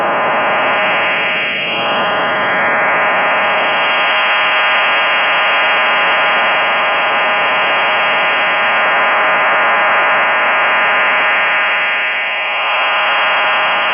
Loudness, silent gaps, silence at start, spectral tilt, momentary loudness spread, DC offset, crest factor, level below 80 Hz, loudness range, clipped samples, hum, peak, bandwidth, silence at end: -11 LUFS; none; 0 s; -7 dB/octave; 3 LU; under 0.1%; 8 dB; -62 dBFS; 2 LU; under 0.1%; none; -6 dBFS; 5.6 kHz; 0 s